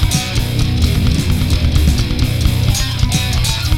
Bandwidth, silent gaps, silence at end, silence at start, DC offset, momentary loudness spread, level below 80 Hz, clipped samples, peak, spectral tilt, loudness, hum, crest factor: 17 kHz; none; 0 s; 0 s; 2%; 2 LU; -18 dBFS; under 0.1%; -2 dBFS; -4.5 dB/octave; -15 LUFS; none; 12 dB